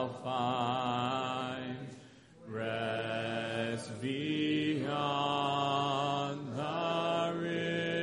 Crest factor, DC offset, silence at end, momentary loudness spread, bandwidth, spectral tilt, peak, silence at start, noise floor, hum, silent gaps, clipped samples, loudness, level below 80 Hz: 16 dB; under 0.1%; 0 s; 7 LU; 10.5 kHz; -5.5 dB/octave; -18 dBFS; 0 s; -55 dBFS; none; none; under 0.1%; -34 LUFS; -72 dBFS